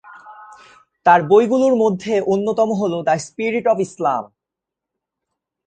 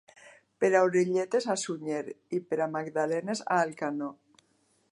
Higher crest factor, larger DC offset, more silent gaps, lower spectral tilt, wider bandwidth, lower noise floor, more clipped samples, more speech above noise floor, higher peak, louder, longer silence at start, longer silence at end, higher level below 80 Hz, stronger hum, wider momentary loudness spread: about the same, 18 dB vs 20 dB; neither; neither; about the same, -6 dB/octave vs -5 dB/octave; second, 9.2 kHz vs 11.5 kHz; first, -84 dBFS vs -70 dBFS; neither; first, 68 dB vs 41 dB; first, 0 dBFS vs -10 dBFS; first, -17 LUFS vs -29 LUFS; second, 0.05 s vs 0.25 s; first, 1.4 s vs 0.8 s; first, -62 dBFS vs -82 dBFS; neither; second, 8 LU vs 11 LU